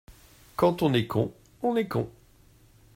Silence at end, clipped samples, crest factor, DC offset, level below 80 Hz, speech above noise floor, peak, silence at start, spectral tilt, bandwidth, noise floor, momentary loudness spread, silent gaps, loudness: 0.85 s; under 0.1%; 18 dB; under 0.1%; -56 dBFS; 32 dB; -10 dBFS; 0.1 s; -7 dB/octave; 16 kHz; -57 dBFS; 10 LU; none; -27 LUFS